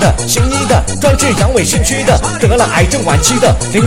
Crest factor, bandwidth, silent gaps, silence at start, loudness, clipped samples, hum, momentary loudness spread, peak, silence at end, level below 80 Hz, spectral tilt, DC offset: 10 dB; 16.5 kHz; none; 0 s; -11 LUFS; under 0.1%; none; 2 LU; 0 dBFS; 0 s; -20 dBFS; -4 dB/octave; 2%